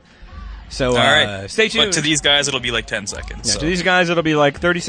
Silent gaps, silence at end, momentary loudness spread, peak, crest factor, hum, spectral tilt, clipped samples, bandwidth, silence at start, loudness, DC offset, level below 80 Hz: none; 0 s; 11 LU; -2 dBFS; 16 dB; none; -3 dB/octave; under 0.1%; 9.8 kHz; 0.2 s; -16 LUFS; under 0.1%; -36 dBFS